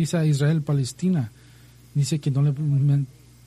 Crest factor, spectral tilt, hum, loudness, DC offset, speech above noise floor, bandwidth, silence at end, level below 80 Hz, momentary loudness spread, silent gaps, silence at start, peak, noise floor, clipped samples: 12 dB; -7 dB/octave; none; -23 LUFS; under 0.1%; 28 dB; 12.5 kHz; 0.4 s; -56 dBFS; 7 LU; none; 0 s; -10 dBFS; -49 dBFS; under 0.1%